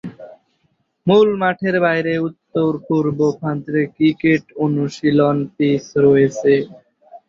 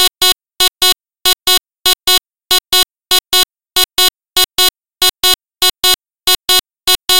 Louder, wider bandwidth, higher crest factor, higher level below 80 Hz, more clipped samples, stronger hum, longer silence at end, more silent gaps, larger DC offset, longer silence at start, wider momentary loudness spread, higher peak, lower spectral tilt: second, -17 LUFS vs -11 LUFS; second, 7.6 kHz vs 17.5 kHz; about the same, 16 dB vs 14 dB; second, -58 dBFS vs -42 dBFS; neither; neither; about the same, 0.1 s vs 0 s; neither; second, under 0.1% vs 2%; about the same, 0.05 s vs 0 s; first, 7 LU vs 4 LU; about the same, -2 dBFS vs 0 dBFS; first, -7.5 dB/octave vs 1.5 dB/octave